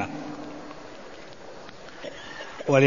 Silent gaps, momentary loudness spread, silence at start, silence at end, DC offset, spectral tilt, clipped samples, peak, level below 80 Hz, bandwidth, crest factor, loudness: none; 10 LU; 0 s; 0 s; 0.5%; -6 dB/octave; under 0.1%; -4 dBFS; -60 dBFS; 7.4 kHz; 24 dB; -35 LUFS